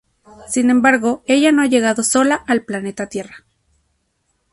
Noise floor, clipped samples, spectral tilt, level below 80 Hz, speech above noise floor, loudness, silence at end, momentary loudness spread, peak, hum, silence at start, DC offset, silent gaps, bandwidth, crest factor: -67 dBFS; under 0.1%; -3 dB/octave; -56 dBFS; 52 dB; -16 LUFS; 1.15 s; 13 LU; -2 dBFS; none; 0.4 s; under 0.1%; none; 12 kHz; 16 dB